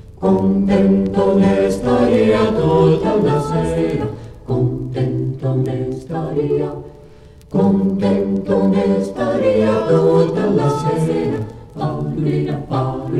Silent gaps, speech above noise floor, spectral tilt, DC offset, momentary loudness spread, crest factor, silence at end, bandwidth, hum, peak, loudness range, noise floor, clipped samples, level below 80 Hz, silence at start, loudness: none; 26 dB; -8.5 dB/octave; under 0.1%; 9 LU; 14 dB; 0 s; 11.5 kHz; none; -2 dBFS; 6 LU; -41 dBFS; under 0.1%; -40 dBFS; 0.05 s; -17 LUFS